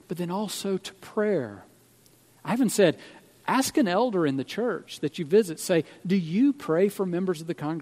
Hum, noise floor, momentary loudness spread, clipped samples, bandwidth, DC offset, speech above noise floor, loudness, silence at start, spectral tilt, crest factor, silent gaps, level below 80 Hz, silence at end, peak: none; -58 dBFS; 9 LU; under 0.1%; 16 kHz; under 0.1%; 33 dB; -26 LUFS; 0.1 s; -5.5 dB/octave; 20 dB; none; -72 dBFS; 0 s; -6 dBFS